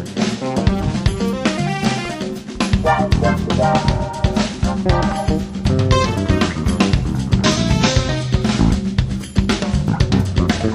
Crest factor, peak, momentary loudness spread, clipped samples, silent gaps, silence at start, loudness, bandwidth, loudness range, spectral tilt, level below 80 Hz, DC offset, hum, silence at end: 16 dB; 0 dBFS; 5 LU; under 0.1%; none; 0 s; -18 LUFS; 14 kHz; 1 LU; -6 dB/octave; -26 dBFS; under 0.1%; none; 0 s